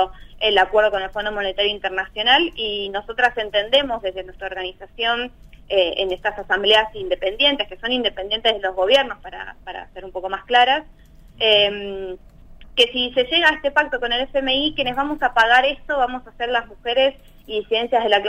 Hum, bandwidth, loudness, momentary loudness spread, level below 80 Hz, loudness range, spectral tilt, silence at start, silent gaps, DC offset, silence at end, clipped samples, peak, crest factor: none; 14 kHz; -19 LUFS; 14 LU; -44 dBFS; 3 LU; -3 dB/octave; 0 s; none; under 0.1%; 0 s; under 0.1%; -2 dBFS; 20 dB